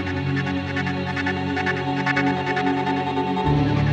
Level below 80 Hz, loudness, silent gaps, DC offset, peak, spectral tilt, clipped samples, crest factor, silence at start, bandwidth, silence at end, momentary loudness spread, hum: -42 dBFS; -23 LUFS; none; under 0.1%; -8 dBFS; -7 dB/octave; under 0.1%; 14 dB; 0 s; 8.4 kHz; 0 s; 4 LU; none